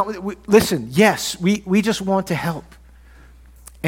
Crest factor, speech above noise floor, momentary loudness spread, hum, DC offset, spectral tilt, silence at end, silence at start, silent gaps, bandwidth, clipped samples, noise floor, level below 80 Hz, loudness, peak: 20 dB; 27 dB; 10 LU; none; under 0.1%; -5 dB/octave; 0 s; 0 s; none; 17 kHz; under 0.1%; -45 dBFS; -46 dBFS; -19 LUFS; 0 dBFS